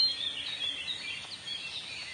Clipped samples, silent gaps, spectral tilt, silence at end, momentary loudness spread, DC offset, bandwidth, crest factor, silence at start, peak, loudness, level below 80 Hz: under 0.1%; none; 0 dB/octave; 0 s; 6 LU; under 0.1%; 11.5 kHz; 18 dB; 0 s; -18 dBFS; -34 LUFS; -72 dBFS